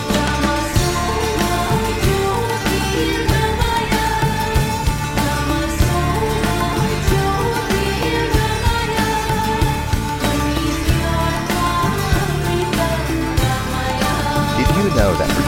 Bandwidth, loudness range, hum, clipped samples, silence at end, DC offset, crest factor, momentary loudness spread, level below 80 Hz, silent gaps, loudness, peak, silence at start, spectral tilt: 17 kHz; 1 LU; none; under 0.1%; 0 s; under 0.1%; 14 dB; 2 LU; -24 dBFS; none; -18 LUFS; -4 dBFS; 0 s; -5 dB/octave